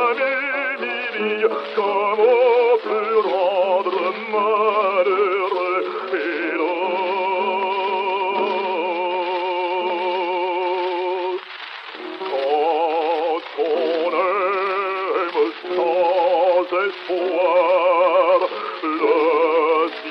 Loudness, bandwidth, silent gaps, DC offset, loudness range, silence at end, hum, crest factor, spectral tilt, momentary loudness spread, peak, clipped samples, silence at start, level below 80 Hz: -20 LUFS; 6 kHz; none; under 0.1%; 5 LU; 0 s; none; 14 dB; -5.5 dB/octave; 7 LU; -6 dBFS; under 0.1%; 0 s; -80 dBFS